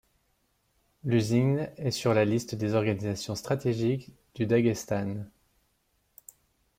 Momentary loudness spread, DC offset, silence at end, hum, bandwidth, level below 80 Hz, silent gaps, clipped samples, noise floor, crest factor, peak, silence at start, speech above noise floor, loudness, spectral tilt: 10 LU; under 0.1%; 1.5 s; none; 16 kHz; -62 dBFS; none; under 0.1%; -73 dBFS; 18 dB; -12 dBFS; 1.05 s; 45 dB; -28 LUFS; -6.5 dB/octave